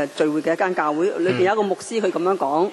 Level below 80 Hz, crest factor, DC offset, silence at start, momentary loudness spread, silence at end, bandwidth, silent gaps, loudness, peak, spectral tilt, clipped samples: -72 dBFS; 14 dB; under 0.1%; 0 s; 3 LU; 0 s; 12 kHz; none; -21 LUFS; -6 dBFS; -5.5 dB/octave; under 0.1%